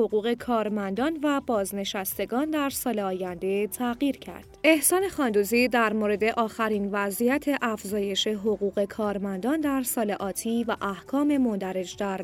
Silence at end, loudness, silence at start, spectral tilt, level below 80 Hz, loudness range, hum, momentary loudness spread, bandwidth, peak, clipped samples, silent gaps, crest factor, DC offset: 0 s; -26 LUFS; 0 s; -4 dB/octave; -58 dBFS; 4 LU; none; 7 LU; 17 kHz; -8 dBFS; under 0.1%; none; 18 dB; under 0.1%